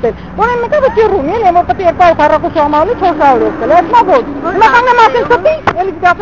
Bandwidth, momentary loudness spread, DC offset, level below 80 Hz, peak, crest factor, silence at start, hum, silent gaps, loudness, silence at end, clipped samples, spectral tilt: 7.8 kHz; 6 LU; 1%; -32 dBFS; 0 dBFS; 10 dB; 0 s; none; none; -9 LUFS; 0 s; 0.5%; -6 dB/octave